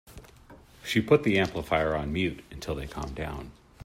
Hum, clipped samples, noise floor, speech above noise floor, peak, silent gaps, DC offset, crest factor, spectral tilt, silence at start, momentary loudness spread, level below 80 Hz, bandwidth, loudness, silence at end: none; under 0.1%; -52 dBFS; 25 dB; -8 dBFS; none; under 0.1%; 22 dB; -6 dB/octave; 0.05 s; 17 LU; -46 dBFS; 16 kHz; -28 LUFS; 0 s